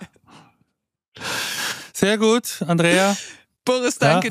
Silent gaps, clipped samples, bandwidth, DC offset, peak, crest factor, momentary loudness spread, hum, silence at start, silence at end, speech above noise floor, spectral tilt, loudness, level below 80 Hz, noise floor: 1.08-1.12 s; under 0.1%; 15.5 kHz; under 0.1%; -2 dBFS; 20 dB; 11 LU; none; 0 s; 0 s; 59 dB; -4 dB/octave; -20 LUFS; -64 dBFS; -77 dBFS